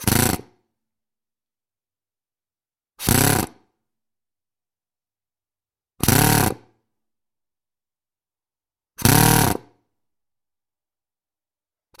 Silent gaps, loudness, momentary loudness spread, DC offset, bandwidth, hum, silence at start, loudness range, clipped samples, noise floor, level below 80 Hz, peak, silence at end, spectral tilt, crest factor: none; -18 LUFS; 15 LU; under 0.1%; 17 kHz; none; 0 s; 3 LU; under 0.1%; under -90 dBFS; -42 dBFS; 0 dBFS; 2.45 s; -4 dB/octave; 24 dB